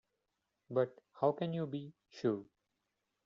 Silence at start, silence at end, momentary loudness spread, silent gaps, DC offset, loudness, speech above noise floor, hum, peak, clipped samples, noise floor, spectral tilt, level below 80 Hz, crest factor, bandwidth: 0.7 s; 0.8 s; 9 LU; none; under 0.1%; -38 LUFS; 49 dB; none; -18 dBFS; under 0.1%; -86 dBFS; -7 dB/octave; -82 dBFS; 22 dB; 7.4 kHz